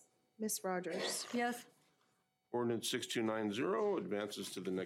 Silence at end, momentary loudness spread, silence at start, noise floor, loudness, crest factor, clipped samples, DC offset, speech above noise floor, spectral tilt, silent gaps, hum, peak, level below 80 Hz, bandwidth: 0 s; 6 LU; 0.4 s; -79 dBFS; -39 LUFS; 14 dB; under 0.1%; under 0.1%; 41 dB; -3.5 dB/octave; none; none; -24 dBFS; under -90 dBFS; 16 kHz